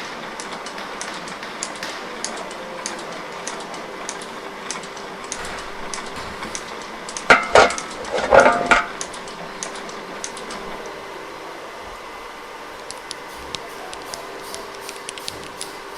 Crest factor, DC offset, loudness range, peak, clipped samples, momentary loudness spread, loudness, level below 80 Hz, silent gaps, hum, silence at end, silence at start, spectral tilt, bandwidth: 24 dB; under 0.1%; 15 LU; 0 dBFS; under 0.1%; 18 LU; -23 LUFS; -48 dBFS; none; none; 0 s; 0 s; -2 dB/octave; 16.5 kHz